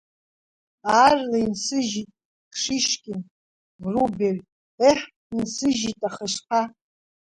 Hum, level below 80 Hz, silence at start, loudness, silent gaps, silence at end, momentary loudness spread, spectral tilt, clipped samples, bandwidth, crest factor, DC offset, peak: none; -58 dBFS; 0.85 s; -23 LUFS; 2.25-2.51 s, 3.31-3.79 s, 4.52-4.78 s, 5.16-5.30 s; 0.65 s; 15 LU; -3.5 dB/octave; under 0.1%; 11.5 kHz; 20 dB; under 0.1%; -4 dBFS